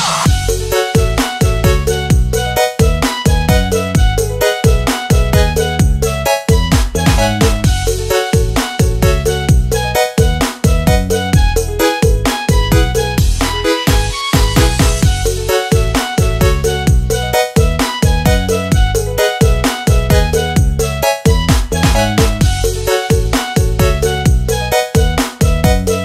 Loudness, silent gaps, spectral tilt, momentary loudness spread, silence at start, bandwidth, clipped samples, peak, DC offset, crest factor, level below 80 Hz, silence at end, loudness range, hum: -13 LUFS; none; -5 dB/octave; 3 LU; 0 s; 16 kHz; under 0.1%; 0 dBFS; under 0.1%; 12 dB; -16 dBFS; 0 s; 1 LU; none